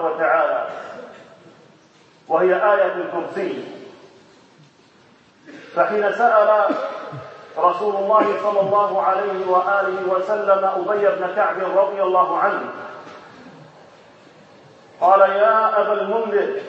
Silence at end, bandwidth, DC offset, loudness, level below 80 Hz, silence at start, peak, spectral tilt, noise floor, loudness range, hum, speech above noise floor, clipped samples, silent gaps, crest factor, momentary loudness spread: 0 s; 7.8 kHz; under 0.1%; -18 LUFS; -78 dBFS; 0 s; -2 dBFS; -6.5 dB/octave; -52 dBFS; 5 LU; none; 34 dB; under 0.1%; none; 18 dB; 17 LU